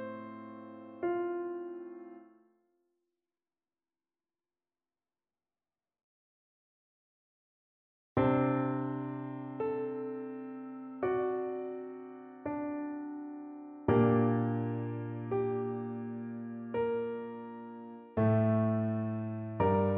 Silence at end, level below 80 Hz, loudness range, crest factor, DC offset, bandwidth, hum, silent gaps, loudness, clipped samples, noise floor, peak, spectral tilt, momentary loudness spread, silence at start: 0 s; -66 dBFS; 9 LU; 20 dB; under 0.1%; 3.8 kHz; none; 6.03-8.16 s; -34 LUFS; under 0.1%; under -90 dBFS; -16 dBFS; -9 dB/octave; 17 LU; 0 s